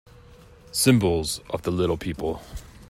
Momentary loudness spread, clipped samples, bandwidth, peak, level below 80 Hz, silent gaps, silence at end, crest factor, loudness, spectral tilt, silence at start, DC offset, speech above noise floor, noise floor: 12 LU; under 0.1%; 16 kHz; -4 dBFS; -44 dBFS; none; 0.05 s; 22 dB; -24 LUFS; -5 dB/octave; 0.3 s; under 0.1%; 25 dB; -49 dBFS